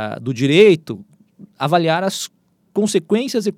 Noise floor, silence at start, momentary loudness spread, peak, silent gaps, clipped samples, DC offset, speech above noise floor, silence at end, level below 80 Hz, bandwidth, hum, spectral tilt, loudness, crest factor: -46 dBFS; 0 s; 16 LU; 0 dBFS; none; under 0.1%; under 0.1%; 29 dB; 0.05 s; -68 dBFS; 15.5 kHz; none; -5 dB/octave; -17 LUFS; 18 dB